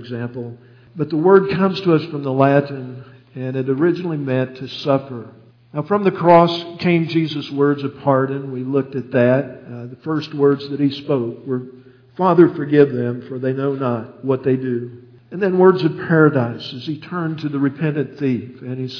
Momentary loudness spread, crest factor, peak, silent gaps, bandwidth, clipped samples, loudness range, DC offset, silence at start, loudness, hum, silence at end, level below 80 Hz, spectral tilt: 16 LU; 18 dB; 0 dBFS; none; 5.4 kHz; under 0.1%; 3 LU; under 0.1%; 0 s; -18 LUFS; none; 0 s; -62 dBFS; -9 dB/octave